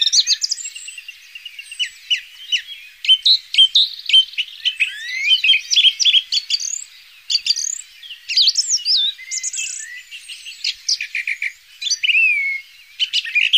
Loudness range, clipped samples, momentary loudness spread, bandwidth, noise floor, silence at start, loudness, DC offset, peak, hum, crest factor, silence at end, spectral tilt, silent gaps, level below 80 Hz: 6 LU; under 0.1%; 21 LU; 15.5 kHz; -41 dBFS; 0 s; -15 LUFS; under 0.1%; -2 dBFS; none; 16 dB; 0 s; 8.5 dB/octave; none; -70 dBFS